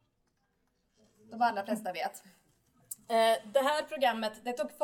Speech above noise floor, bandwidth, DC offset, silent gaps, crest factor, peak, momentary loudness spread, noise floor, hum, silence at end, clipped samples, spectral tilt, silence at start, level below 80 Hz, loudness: 45 dB; 19 kHz; under 0.1%; none; 20 dB; -14 dBFS; 18 LU; -76 dBFS; none; 0 s; under 0.1%; -3 dB/octave; 1.3 s; -80 dBFS; -31 LUFS